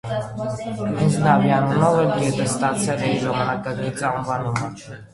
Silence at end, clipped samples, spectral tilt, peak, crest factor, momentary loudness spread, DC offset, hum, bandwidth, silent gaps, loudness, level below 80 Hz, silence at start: 0.1 s; under 0.1%; -6 dB/octave; -2 dBFS; 18 dB; 10 LU; under 0.1%; none; 11.5 kHz; none; -21 LUFS; -50 dBFS; 0.05 s